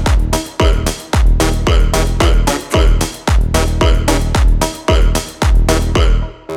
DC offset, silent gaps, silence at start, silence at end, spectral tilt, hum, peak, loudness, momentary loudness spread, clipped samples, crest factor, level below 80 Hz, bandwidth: under 0.1%; none; 0 s; 0 s; -5 dB/octave; none; 0 dBFS; -14 LUFS; 3 LU; under 0.1%; 12 dB; -14 dBFS; 15.5 kHz